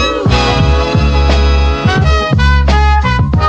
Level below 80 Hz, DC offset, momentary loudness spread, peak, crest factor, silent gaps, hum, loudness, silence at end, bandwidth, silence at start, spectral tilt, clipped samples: -12 dBFS; under 0.1%; 2 LU; 0 dBFS; 10 dB; none; none; -11 LUFS; 0 s; 8 kHz; 0 s; -6 dB/octave; 0.1%